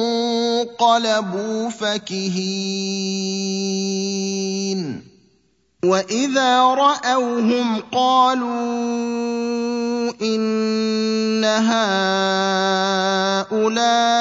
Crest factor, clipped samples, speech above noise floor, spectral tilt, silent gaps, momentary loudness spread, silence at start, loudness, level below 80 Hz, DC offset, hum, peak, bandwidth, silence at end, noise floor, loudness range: 16 dB; under 0.1%; 43 dB; -4 dB/octave; none; 7 LU; 0 s; -19 LUFS; -68 dBFS; under 0.1%; none; -2 dBFS; 7.8 kHz; 0 s; -62 dBFS; 5 LU